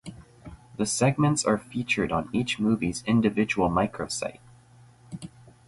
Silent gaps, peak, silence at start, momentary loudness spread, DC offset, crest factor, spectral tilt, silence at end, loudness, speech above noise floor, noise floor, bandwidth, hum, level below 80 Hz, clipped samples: none; -10 dBFS; 0.05 s; 19 LU; under 0.1%; 18 dB; -5 dB/octave; 0.4 s; -26 LUFS; 29 dB; -54 dBFS; 11.5 kHz; none; -52 dBFS; under 0.1%